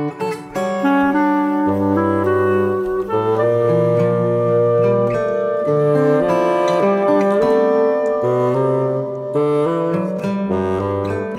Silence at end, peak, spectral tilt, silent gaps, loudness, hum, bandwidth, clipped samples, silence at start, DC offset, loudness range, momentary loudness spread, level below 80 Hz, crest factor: 0 s; -2 dBFS; -8 dB/octave; none; -17 LUFS; none; 13.5 kHz; under 0.1%; 0 s; under 0.1%; 2 LU; 6 LU; -52 dBFS; 14 dB